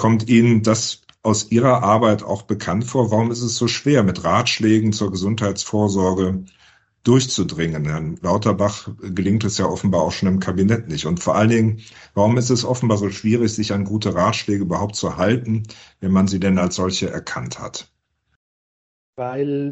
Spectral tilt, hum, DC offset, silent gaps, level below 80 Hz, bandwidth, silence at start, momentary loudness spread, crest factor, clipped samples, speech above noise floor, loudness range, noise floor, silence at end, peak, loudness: -5.5 dB/octave; none; under 0.1%; 18.36-19.13 s; -48 dBFS; 8.4 kHz; 0 s; 9 LU; 16 dB; under 0.1%; over 72 dB; 3 LU; under -90 dBFS; 0 s; -2 dBFS; -19 LUFS